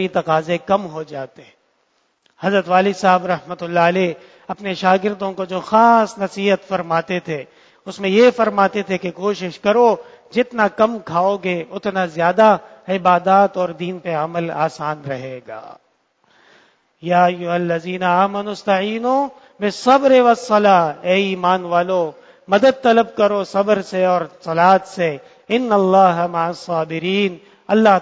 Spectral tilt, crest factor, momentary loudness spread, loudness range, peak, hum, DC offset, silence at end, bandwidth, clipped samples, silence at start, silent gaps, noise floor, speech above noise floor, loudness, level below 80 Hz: -6 dB/octave; 18 dB; 12 LU; 5 LU; 0 dBFS; none; under 0.1%; 0 s; 8 kHz; under 0.1%; 0 s; none; -64 dBFS; 47 dB; -17 LUFS; -64 dBFS